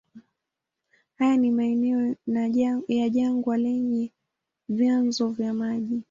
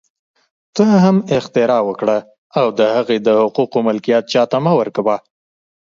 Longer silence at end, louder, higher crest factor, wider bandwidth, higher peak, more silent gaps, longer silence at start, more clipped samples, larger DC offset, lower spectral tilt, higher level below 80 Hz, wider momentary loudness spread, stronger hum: second, 0.1 s vs 0.65 s; second, -25 LUFS vs -15 LUFS; about the same, 12 dB vs 16 dB; about the same, 7.4 kHz vs 7.6 kHz; second, -12 dBFS vs 0 dBFS; second, none vs 2.38-2.50 s; second, 0.15 s vs 0.75 s; neither; neither; about the same, -6 dB/octave vs -7 dB/octave; second, -68 dBFS vs -60 dBFS; about the same, 6 LU vs 6 LU; neither